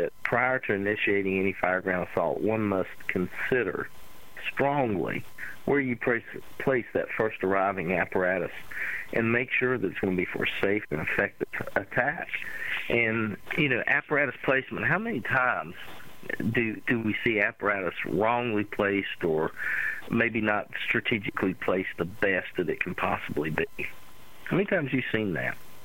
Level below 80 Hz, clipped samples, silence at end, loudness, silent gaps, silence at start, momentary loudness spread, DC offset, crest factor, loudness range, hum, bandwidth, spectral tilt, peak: -56 dBFS; under 0.1%; 0 s; -28 LUFS; none; 0 s; 8 LU; 0.5%; 20 dB; 3 LU; none; 16 kHz; -7 dB/octave; -8 dBFS